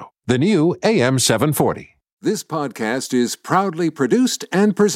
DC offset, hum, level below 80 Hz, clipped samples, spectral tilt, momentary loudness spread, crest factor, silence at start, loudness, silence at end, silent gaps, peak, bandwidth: under 0.1%; none; -56 dBFS; under 0.1%; -5 dB/octave; 8 LU; 14 dB; 0 s; -18 LUFS; 0 s; 2.13-2.17 s; -4 dBFS; 16.5 kHz